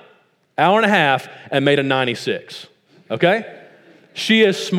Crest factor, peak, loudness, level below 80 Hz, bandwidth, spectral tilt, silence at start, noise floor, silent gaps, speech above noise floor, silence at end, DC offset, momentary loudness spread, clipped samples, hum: 18 dB; 0 dBFS; -17 LUFS; -72 dBFS; 15.5 kHz; -5 dB/octave; 0.6 s; -56 dBFS; none; 39 dB; 0 s; under 0.1%; 18 LU; under 0.1%; none